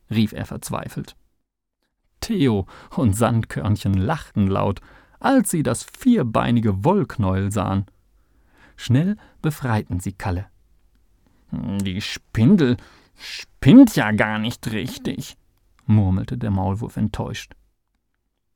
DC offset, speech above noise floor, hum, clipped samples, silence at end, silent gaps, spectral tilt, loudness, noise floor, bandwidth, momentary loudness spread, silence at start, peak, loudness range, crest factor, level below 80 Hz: under 0.1%; 56 dB; none; under 0.1%; 1.1 s; none; -6.5 dB/octave; -20 LUFS; -75 dBFS; 18.5 kHz; 16 LU; 0.1 s; 0 dBFS; 8 LU; 20 dB; -46 dBFS